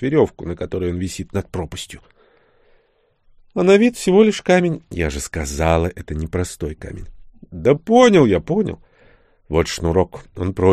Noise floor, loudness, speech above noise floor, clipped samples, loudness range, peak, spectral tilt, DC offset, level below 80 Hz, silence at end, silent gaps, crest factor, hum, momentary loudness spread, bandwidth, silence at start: -61 dBFS; -18 LUFS; 43 dB; under 0.1%; 6 LU; 0 dBFS; -6 dB/octave; under 0.1%; -36 dBFS; 0 s; none; 18 dB; none; 15 LU; 14.5 kHz; 0 s